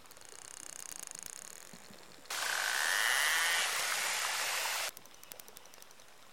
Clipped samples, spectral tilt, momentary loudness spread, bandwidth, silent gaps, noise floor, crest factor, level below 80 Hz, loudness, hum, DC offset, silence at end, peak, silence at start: under 0.1%; 2 dB/octave; 24 LU; 17 kHz; none; -58 dBFS; 20 dB; -78 dBFS; -32 LUFS; none; 0.1%; 0 s; -18 dBFS; 0 s